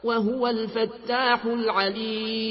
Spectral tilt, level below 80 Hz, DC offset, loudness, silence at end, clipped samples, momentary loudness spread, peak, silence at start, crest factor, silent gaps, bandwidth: -9 dB/octave; -62 dBFS; under 0.1%; -25 LUFS; 0 s; under 0.1%; 5 LU; -10 dBFS; 0.05 s; 16 dB; none; 5.8 kHz